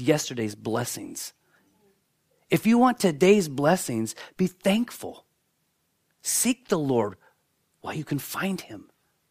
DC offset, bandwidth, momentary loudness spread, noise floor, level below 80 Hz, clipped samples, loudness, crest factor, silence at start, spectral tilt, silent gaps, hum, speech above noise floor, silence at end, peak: under 0.1%; 15.5 kHz; 16 LU; -73 dBFS; -66 dBFS; under 0.1%; -25 LUFS; 20 dB; 0 s; -4.5 dB/octave; none; none; 48 dB; 0.5 s; -6 dBFS